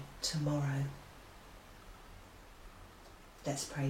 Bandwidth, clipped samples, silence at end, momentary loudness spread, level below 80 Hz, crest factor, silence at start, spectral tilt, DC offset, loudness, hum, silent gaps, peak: 16 kHz; under 0.1%; 0 s; 22 LU; -58 dBFS; 20 dB; 0 s; -5 dB/octave; under 0.1%; -37 LUFS; none; none; -22 dBFS